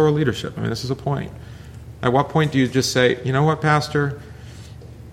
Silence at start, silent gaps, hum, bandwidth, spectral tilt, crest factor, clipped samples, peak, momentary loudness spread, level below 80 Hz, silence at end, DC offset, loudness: 0 s; none; none; 15 kHz; -5.5 dB/octave; 18 dB; under 0.1%; -2 dBFS; 21 LU; -44 dBFS; 0 s; under 0.1%; -20 LUFS